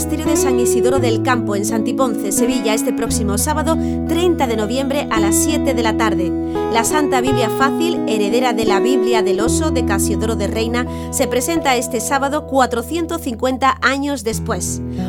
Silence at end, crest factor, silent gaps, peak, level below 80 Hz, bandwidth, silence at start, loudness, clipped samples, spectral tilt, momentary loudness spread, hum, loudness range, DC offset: 0 s; 16 dB; none; 0 dBFS; -34 dBFS; over 20 kHz; 0 s; -17 LUFS; under 0.1%; -4.5 dB/octave; 5 LU; none; 2 LU; under 0.1%